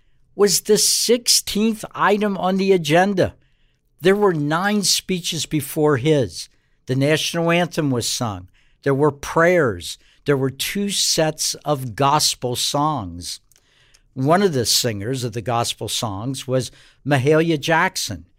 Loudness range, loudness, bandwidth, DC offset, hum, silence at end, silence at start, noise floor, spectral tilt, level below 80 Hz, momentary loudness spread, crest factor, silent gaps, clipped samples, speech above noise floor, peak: 3 LU; -19 LUFS; 16 kHz; under 0.1%; none; 0.15 s; 0.35 s; -60 dBFS; -3.5 dB/octave; -52 dBFS; 11 LU; 18 dB; none; under 0.1%; 41 dB; -2 dBFS